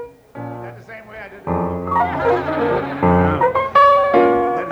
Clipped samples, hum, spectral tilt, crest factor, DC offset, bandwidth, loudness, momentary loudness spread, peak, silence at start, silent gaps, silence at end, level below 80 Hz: under 0.1%; none; -8 dB/octave; 14 dB; under 0.1%; 9.6 kHz; -16 LUFS; 22 LU; -4 dBFS; 0 s; none; 0 s; -42 dBFS